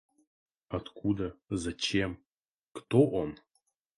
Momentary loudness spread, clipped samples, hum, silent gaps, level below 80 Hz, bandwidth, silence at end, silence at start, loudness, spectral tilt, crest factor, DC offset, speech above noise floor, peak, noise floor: 23 LU; under 0.1%; none; 2.26-2.37 s, 2.48-2.71 s; -54 dBFS; 11.5 kHz; 0.65 s; 0.7 s; -32 LUFS; -5.5 dB/octave; 22 dB; under 0.1%; 47 dB; -10 dBFS; -78 dBFS